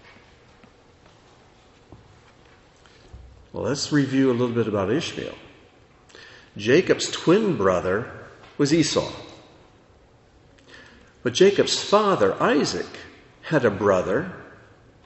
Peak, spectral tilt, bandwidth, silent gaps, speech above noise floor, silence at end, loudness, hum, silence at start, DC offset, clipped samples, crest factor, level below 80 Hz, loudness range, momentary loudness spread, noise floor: -4 dBFS; -5 dB/octave; 8.2 kHz; none; 33 dB; 0.55 s; -22 LUFS; none; 1.9 s; under 0.1%; under 0.1%; 20 dB; -56 dBFS; 6 LU; 20 LU; -54 dBFS